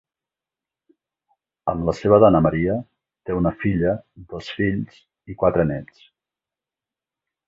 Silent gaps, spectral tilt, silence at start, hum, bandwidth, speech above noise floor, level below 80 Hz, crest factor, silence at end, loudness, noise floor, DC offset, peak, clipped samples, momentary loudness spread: none; -8.5 dB/octave; 1.65 s; none; 7.6 kHz; 69 dB; -44 dBFS; 20 dB; 1.65 s; -20 LUFS; -89 dBFS; under 0.1%; -2 dBFS; under 0.1%; 20 LU